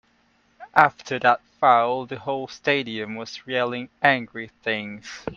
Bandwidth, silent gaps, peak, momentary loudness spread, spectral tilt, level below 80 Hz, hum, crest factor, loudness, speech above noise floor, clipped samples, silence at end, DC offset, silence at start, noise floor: 7.4 kHz; none; 0 dBFS; 13 LU; -4.5 dB/octave; -62 dBFS; none; 24 dB; -22 LUFS; 40 dB; under 0.1%; 0 s; under 0.1%; 0.6 s; -63 dBFS